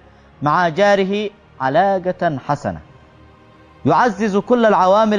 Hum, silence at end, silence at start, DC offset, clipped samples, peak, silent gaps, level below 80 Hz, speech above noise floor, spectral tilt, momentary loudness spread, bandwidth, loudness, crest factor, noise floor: none; 0 s; 0.4 s; under 0.1%; under 0.1%; -2 dBFS; none; -50 dBFS; 31 dB; -6.5 dB/octave; 11 LU; 10 kHz; -17 LUFS; 14 dB; -46 dBFS